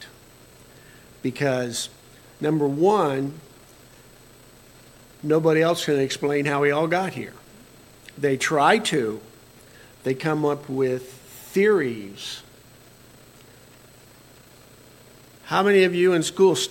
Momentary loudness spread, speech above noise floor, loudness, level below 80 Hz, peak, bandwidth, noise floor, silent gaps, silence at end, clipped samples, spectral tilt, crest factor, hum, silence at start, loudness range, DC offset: 16 LU; 28 dB; -22 LUFS; -62 dBFS; -2 dBFS; 17 kHz; -50 dBFS; none; 0 s; under 0.1%; -5 dB/octave; 22 dB; none; 0 s; 5 LU; under 0.1%